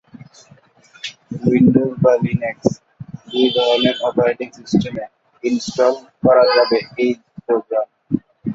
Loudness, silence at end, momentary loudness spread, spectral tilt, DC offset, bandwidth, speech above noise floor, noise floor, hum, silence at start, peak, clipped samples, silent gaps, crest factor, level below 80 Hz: -17 LUFS; 0 s; 17 LU; -6 dB/octave; under 0.1%; 7.8 kHz; 34 dB; -50 dBFS; none; 1.05 s; -2 dBFS; under 0.1%; none; 16 dB; -52 dBFS